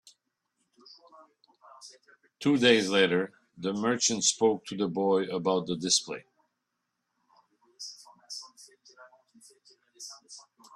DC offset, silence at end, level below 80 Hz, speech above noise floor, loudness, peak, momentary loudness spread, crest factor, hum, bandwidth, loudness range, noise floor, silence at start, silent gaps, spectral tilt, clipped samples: under 0.1%; 0.35 s; -74 dBFS; 55 dB; -26 LUFS; -8 dBFS; 25 LU; 24 dB; none; 12.5 kHz; 21 LU; -82 dBFS; 1.8 s; none; -3 dB/octave; under 0.1%